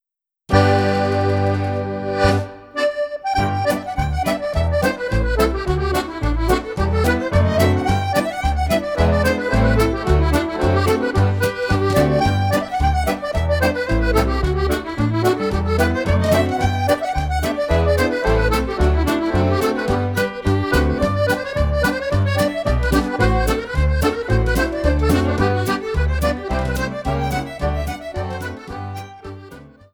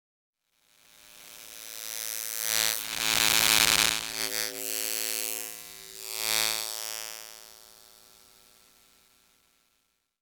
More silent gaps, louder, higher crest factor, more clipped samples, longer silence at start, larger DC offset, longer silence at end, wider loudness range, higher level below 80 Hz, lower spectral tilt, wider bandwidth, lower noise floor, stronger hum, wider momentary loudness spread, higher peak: neither; first, -19 LUFS vs -26 LUFS; second, 16 dB vs 30 dB; neither; second, 0.5 s vs 1.05 s; neither; second, 0.3 s vs 2.4 s; second, 3 LU vs 9 LU; first, -26 dBFS vs -60 dBFS; first, -6.5 dB/octave vs 1 dB/octave; about the same, over 20 kHz vs over 20 kHz; second, -48 dBFS vs -75 dBFS; neither; second, 6 LU vs 22 LU; about the same, -2 dBFS vs -2 dBFS